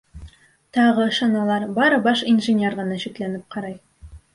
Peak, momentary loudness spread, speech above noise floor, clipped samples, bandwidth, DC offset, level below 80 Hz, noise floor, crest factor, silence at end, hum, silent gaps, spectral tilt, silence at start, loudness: -6 dBFS; 14 LU; 26 dB; under 0.1%; 11.5 kHz; under 0.1%; -50 dBFS; -46 dBFS; 16 dB; 0.15 s; none; none; -5.5 dB/octave; 0.15 s; -20 LUFS